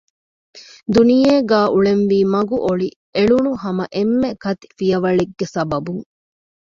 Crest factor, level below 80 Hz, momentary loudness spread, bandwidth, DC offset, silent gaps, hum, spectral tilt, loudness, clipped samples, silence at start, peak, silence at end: 16 dB; -50 dBFS; 10 LU; 7.6 kHz; under 0.1%; 2.96-3.13 s; none; -7 dB/octave; -17 LUFS; under 0.1%; 0.55 s; -2 dBFS; 0.7 s